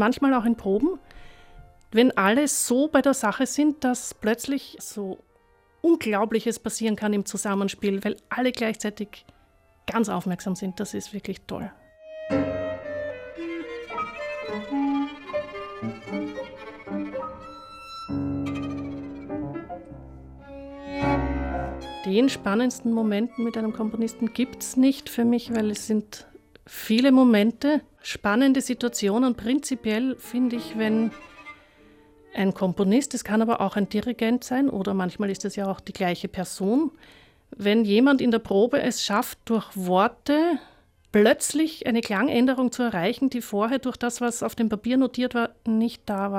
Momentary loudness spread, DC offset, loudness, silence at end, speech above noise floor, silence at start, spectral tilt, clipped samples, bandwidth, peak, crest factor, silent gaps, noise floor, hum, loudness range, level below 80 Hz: 14 LU; under 0.1%; -25 LUFS; 0 s; 37 dB; 0 s; -5 dB/octave; under 0.1%; 16 kHz; -6 dBFS; 18 dB; none; -61 dBFS; none; 9 LU; -50 dBFS